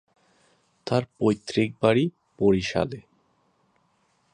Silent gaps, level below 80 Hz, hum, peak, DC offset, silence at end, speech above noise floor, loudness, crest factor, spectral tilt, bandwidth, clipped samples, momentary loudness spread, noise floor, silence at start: none; -54 dBFS; none; -6 dBFS; under 0.1%; 1.35 s; 44 dB; -25 LUFS; 22 dB; -6.5 dB/octave; 10 kHz; under 0.1%; 9 LU; -68 dBFS; 0.85 s